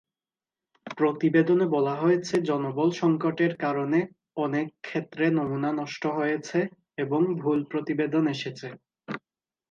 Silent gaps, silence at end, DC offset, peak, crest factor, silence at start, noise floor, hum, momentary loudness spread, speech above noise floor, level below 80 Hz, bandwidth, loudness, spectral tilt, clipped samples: none; 0.5 s; under 0.1%; -8 dBFS; 18 dB; 0.85 s; under -90 dBFS; none; 12 LU; over 65 dB; -74 dBFS; 7.6 kHz; -26 LUFS; -7 dB/octave; under 0.1%